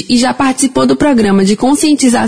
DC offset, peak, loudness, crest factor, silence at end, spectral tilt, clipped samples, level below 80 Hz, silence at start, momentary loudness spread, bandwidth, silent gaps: 1%; 0 dBFS; -10 LUFS; 10 dB; 0 s; -4.5 dB/octave; under 0.1%; -40 dBFS; 0 s; 2 LU; 11 kHz; none